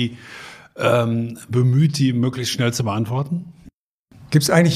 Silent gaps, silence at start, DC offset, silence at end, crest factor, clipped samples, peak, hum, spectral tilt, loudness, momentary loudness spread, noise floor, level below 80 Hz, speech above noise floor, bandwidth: 3.74-4.05 s; 0 s; under 0.1%; 0 s; 18 dB; under 0.1%; -2 dBFS; none; -5.5 dB/octave; -20 LUFS; 15 LU; -53 dBFS; -56 dBFS; 34 dB; 15.5 kHz